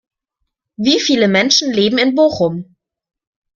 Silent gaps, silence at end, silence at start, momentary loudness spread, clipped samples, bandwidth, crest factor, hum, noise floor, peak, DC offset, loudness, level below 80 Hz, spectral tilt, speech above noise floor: none; 0.9 s; 0.8 s; 8 LU; under 0.1%; 7.4 kHz; 16 dB; none; -74 dBFS; 0 dBFS; under 0.1%; -13 LUFS; -56 dBFS; -3.5 dB/octave; 61 dB